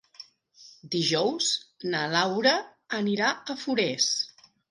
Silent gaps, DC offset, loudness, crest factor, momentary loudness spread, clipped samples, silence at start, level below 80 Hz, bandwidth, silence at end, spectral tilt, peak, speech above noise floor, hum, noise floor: none; under 0.1%; -26 LUFS; 20 dB; 9 LU; under 0.1%; 0.2 s; -76 dBFS; 11.5 kHz; 0.45 s; -3 dB/octave; -8 dBFS; 28 dB; none; -54 dBFS